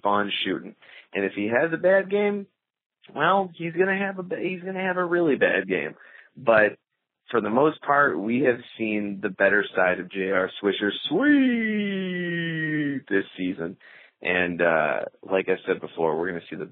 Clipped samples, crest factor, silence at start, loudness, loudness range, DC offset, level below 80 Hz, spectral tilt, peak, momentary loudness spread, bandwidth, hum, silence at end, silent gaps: under 0.1%; 20 dB; 0.05 s; -24 LUFS; 3 LU; under 0.1%; -70 dBFS; -3.5 dB/octave; -6 dBFS; 9 LU; 4.3 kHz; none; 0.05 s; 2.86-2.90 s